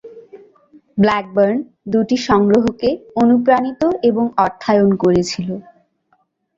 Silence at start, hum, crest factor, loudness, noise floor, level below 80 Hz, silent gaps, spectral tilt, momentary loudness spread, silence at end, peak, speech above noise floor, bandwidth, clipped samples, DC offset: 0.05 s; none; 16 dB; -16 LUFS; -62 dBFS; -48 dBFS; none; -6.5 dB/octave; 9 LU; 0.95 s; 0 dBFS; 47 dB; 7.8 kHz; under 0.1%; under 0.1%